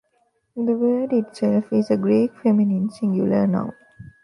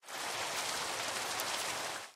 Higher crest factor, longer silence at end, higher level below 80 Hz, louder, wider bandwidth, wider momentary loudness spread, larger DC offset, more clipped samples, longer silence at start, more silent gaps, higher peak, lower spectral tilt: second, 14 dB vs 22 dB; first, 0.2 s vs 0 s; first, -62 dBFS vs -74 dBFS; first, -21 LUFS vs -36 LUFS; second, 10.5 kHz vs 16 kHz; first, 6 LU vs 2 LU; neither; neither; first, 0.55 s vs 0.05 s; neither; first, -8 dBFS vs -16 dBFS; first, -9 dB/octave vs 0 dB/octave